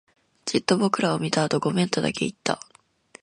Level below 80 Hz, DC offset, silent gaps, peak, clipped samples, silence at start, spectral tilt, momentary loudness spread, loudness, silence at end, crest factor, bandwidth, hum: -62 dBFS; under 0.1%; none; -4 dBFS; under 0.1%; 0.45 s; -5 dB/octave; 7 LU; -24 LUFS; 0.65 s; 22 dB; 11.5 kHz; none